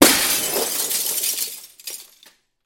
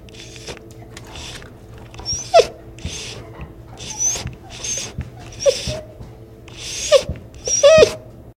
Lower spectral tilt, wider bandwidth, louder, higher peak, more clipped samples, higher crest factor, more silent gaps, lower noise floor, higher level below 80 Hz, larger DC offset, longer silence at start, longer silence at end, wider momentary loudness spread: second, -0.5 dB/octave vs -2.5 dB/octave; about the same, 17 kHz vs 16 kHz; about the same, -19 LUFS vs -17 LUFS; about the same, 0 dBFS vs 0 dBFS; neither; about the same, 22 dB vs 20 dB; neither; first, -54 dBFS vs -39 dBFS; second, -56 dBFS vs -42 dBFS; neither; about the same, 0 s vs 0.05 s; first, 0.65 s vs 0.1 s; second, 17 LU vs 24 LU